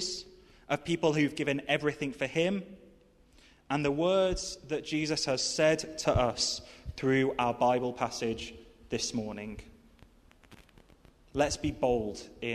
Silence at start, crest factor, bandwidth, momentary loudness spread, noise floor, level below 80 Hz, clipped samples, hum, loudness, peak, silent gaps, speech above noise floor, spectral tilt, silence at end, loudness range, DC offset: 0 s; 20 dB; 13.5 kHz; 12 LU; -61 dBFS; -52 dBFS; under 0.1%; none; -31 LUFS; -12 dBFS; none; 30 dB; -4 dB/octave; 0 s; 7 LU; under 0.1%